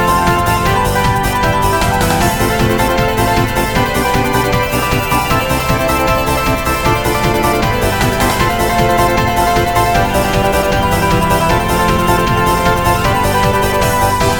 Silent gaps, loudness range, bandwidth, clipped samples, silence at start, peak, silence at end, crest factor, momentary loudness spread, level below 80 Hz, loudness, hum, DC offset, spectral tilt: none; 1 LU; 19.5 kHz; under 0.1%; 0 s; 0 dBFS; 0 s; 12 dB; 2 LU; -24 dBFS; -13 LUFS; none; 0.1%; -4.5 dB/octave